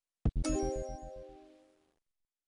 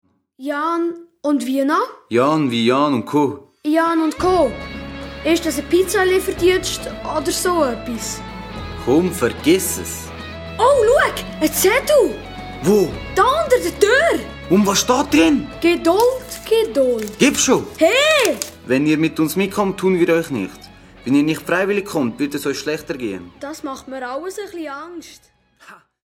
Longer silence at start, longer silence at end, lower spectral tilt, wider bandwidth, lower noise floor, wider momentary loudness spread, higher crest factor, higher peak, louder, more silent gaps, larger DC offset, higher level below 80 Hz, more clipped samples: second, 0.25 s vs 0.4 s; first, 1 s vs 0.3 s; first, -6 dB/octave vs -4 dB/octave; second, 11.5 kHz vs 19 kHz; first, -87 dBFS vs -46 dBFS; first, 19 LU vs 15 LU; about the same, 18 dB vs 18 dB; second, -20 dBFS vs 0 dBFS; second, -37 LUFS vs -17 LUFS; neither; neither; about the same, -42 dBFS vs -42 dBFS; neither